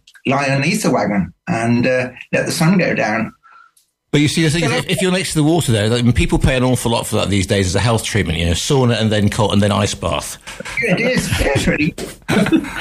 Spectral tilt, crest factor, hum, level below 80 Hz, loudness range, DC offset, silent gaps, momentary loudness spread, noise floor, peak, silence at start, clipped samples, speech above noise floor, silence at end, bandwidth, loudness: -5 dB/octave; 14 dB; none; -32 dBFS; 2 LU; under 0.1%; none; 6 LU; -54 dBFS; -2 dBFS; 0.25 s; under 0.1%; 39 dB; 0 s; 15.5 kHz; -16 LUFS